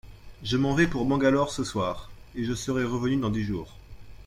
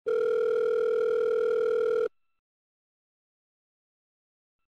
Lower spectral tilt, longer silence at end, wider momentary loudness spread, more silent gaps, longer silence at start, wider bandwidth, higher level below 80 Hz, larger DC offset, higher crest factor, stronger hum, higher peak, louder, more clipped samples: first, -6 dB/octave vs -4.5 dB/octave; second, 0.05 s vs 2.6 s; first, 14 LU vs 2 LU; neither; about the same, 0.05 s vs 0.05 s; first, 15 kHz vs 6.4 kHz; first, -46 dBFS vs -72 dBFS; neither; first, 18 dB vs 8 dB; neither; first, -8 dBFS vs -22 dBFS; about the same, -27 LUFS vs -27 LUFS; neither